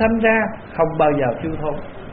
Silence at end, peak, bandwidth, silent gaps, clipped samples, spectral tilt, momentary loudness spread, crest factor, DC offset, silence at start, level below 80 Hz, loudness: 0 s; -4 dBFS; 4.3 kHz; none; under 0.1%; -5.5 dB/octave; 10 LU; 16 dB; under 0.1%; 0 s; -40 dBFS; -19 LUFS